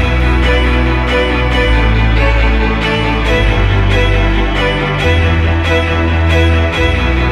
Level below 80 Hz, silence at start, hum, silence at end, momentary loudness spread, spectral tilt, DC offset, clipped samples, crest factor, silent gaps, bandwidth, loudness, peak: -14 dBFS; 0 s; none; 0 s; 2 LU; -6.5 dB/octave; under 0.1%; under 0.1%; 10 dB; none; 10.5 kHz; -12 LUFS; 0 dBFS